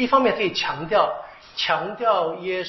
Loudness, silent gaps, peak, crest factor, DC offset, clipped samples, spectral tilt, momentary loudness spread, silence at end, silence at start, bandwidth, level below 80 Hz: -22 LUFS; none; -4 dBFS; 18 dB; under 0.1%; under 0.1%; -1.5 dB/octave; 7 LU; 0 s; 0 s; 6.2 kHz; -56 dBFS